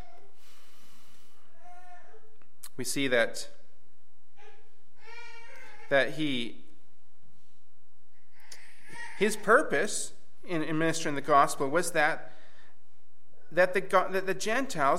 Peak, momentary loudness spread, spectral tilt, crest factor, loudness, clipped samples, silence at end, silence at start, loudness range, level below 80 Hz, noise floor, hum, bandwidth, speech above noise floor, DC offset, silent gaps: -8 dBFS; 24 LU; -3.5 dB/octave; 24 dB; -28 LUFS; under 0.1%; 0 s; 1.65 s; 7 LU; -72 dBFS; -71 dBFS; none; 16.5 kHz; 43 dB; 3%; none